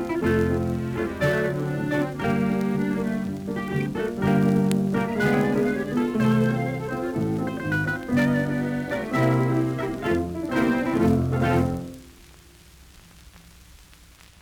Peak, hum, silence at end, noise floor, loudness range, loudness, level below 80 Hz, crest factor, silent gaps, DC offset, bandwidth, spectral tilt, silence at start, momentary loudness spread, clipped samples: -6 dBFS; none; 0.45 s; -50 dBFS; 3 LU; -24 LUFS; -48 dBFS; 18 dB; none; under 0.1%; over 20 kHz; -7.5 dB/octave; 0 s; 6 LU; under 0.1%